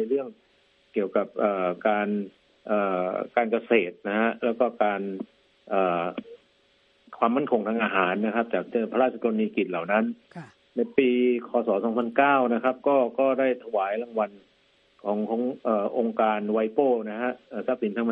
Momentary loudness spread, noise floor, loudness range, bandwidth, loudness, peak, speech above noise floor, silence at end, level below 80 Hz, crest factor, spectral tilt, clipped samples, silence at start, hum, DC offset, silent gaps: 9 LU; -64 dBFS; 4 LU; 4.4 kHz; -26 LUFS; -6 dBFS; 39 dB; 0 s; -76 dBFS; 20 dB; -9 dB/octave; under 0.1%; 0 s; none; under 0.1%; none